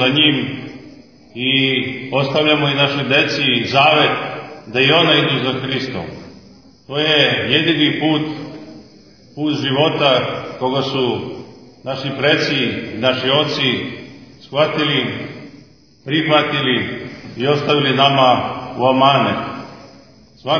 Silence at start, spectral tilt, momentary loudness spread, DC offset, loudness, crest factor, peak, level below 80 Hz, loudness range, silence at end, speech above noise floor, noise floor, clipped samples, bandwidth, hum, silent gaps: 0 s; -5.5 dB/octave; 17 LU; 0.2%; -15 LUFS; 18 dB; 0 dBFS; -56 dBFS; 4 LU; 0 s; 30 dB; -46 dBFS; under 0.1%; 5.4 kHz; none; none